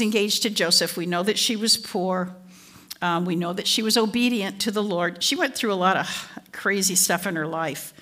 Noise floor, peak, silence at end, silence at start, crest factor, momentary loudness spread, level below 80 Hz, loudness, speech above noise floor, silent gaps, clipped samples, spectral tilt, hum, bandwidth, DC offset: -48 dBFS; -6 dBFS; 0.1 s; 0 s; 18 dB; 9 LU; -70 dBFS; -22 LUFS; 24 dB; none; under 0.1%; -2.5 dB/octave; none; 16 kHz; under 0.1%